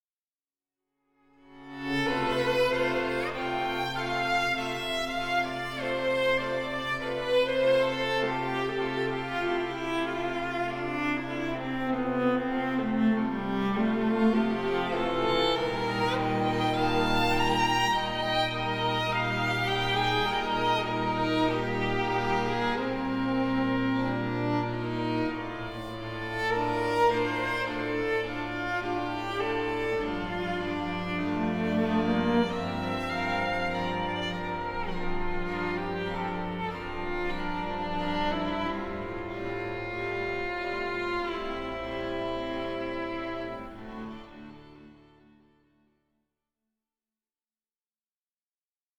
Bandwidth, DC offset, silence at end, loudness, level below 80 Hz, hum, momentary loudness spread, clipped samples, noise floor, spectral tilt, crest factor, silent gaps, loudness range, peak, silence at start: 19.5 kHz; under 0.1%; 4.05 s; -29 LUFS; -46 dBFS; none; 8 LU; under 0.1%; under -90 dBFS; -5.5 dB/octave; 18 dB; none; 6 LU; -12 dBFS; 1.5 s